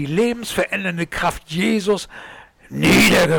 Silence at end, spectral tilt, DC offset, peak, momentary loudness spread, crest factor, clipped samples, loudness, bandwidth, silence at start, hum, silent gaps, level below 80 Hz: 0 s; -4.5 dB/octave; under 0.1%; -8 dBFS; 14 LU; 10 dB; under 0.1%; -18 LUFS; 19 kHz; 0 s; none; none; -42 dBFS